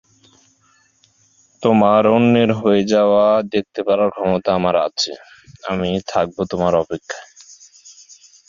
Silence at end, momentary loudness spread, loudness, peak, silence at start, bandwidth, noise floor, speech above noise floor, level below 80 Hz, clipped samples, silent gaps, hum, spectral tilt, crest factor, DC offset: 0.6 s; 13 LU; -17 LUFS; -2 dBFS; 1.6 s; 7.4 kHz; -58 dBFS; 41 dB; -50 dBFS; under 0.1%; none; none; -6 dB/octave; 16 dB; under 0.1%